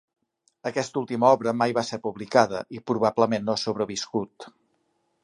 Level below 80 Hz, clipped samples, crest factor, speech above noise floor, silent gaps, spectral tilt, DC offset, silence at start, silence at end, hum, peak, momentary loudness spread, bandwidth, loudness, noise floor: -66 dBFS; under 0.1%; 22 dB; 47 dB; none; -5 dB/octave; under 0.1%; 0.65 s; 0.75 s; none; -4 dBFS; 11 LU; 11 kHz; -25 LUFS; -72 dBFS